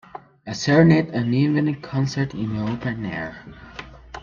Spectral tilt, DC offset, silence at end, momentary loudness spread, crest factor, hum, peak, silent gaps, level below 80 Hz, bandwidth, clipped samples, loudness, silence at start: -7 dB/octave; under 0.1%; 0 s; 23 LU; 20 dB; none; -2 dBFS; none; -50 dBFS; 7.4 kHz; under 0.1%; -21 LUFS; 0.15 s